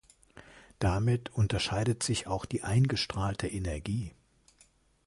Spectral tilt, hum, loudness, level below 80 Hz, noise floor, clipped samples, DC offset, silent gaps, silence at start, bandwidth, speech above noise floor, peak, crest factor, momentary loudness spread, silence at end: -5 dB/octave; none; -31 LUFS; -46 dBFS; -65 dBFS; under 0.1%; under 0.1%; none; 0.35 s; 11.5 kHz; 35 dB; -16 dBFS; 16 dB; 7 LU; 0.95 s